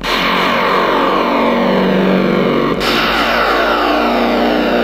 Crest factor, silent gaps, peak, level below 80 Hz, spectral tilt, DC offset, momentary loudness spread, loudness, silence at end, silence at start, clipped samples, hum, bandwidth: 12 dB; none; 0 dBFS; -36 dBFS; -5.5 dB/octave; under 0.1%; 1 LU; -13 LUFS; 0 s; 0 s; under 0.1%; none; 16 kHz